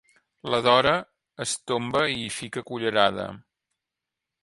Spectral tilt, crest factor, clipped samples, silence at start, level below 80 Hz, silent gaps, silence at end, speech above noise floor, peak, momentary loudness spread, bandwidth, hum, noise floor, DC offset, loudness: -3.5 dB/octave; 22 dB; under 0.1%; 0.45 s; -60 dBFS; none; 1 s; 62 dB; -4 dBFS; 15 LU; 11.5 kHz; none; -86 dBFS; under 0.1%; -24 LUFS